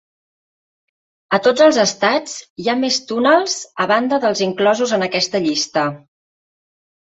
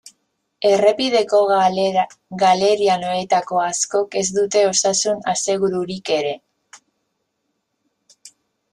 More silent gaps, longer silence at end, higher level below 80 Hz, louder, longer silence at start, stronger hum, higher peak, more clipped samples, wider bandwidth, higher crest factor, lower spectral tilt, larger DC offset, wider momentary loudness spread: first, 2.50-2.56 s vs none; first, 1.15 s vs 0.45 s; about the same, -64 dBFS vs -64 dBFS; about the same, -16 LUFS vs -18 LUFS; first, 1.3 s vs 0.6 s; neither; about the same, -2 dBFS vs -2 dBFS; neither; second, 8.2 kHz vs 12 kHz; about the same, 16 dB vs 18 dB; about the same, -3 dB/octave vs -3 dB/octave; neither; first, 9 LU vs 6 LU